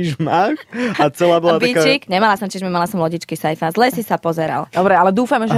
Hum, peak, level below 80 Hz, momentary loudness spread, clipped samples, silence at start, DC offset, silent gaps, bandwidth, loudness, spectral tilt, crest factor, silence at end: none; -2 dBFS; -58 dBFS; 7 LU; under 0.1%; 0 s; under 0.1%; none; 15.5 kHz; -16 LUFS; -5.5 dB/octave; 14 dB; 0 s